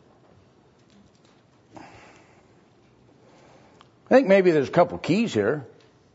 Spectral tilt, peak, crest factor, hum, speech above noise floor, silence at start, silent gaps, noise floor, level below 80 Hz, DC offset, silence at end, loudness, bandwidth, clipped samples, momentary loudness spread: -6.5 dB/octave; -6 dBFS; 20 dB; none; 38 dB; 4.1 s; none; -58 dBFS; -66 dBFS; under 0.1%; 0.5 s; -21 LUFS; 8 kHz; under 0.1%; 8 LU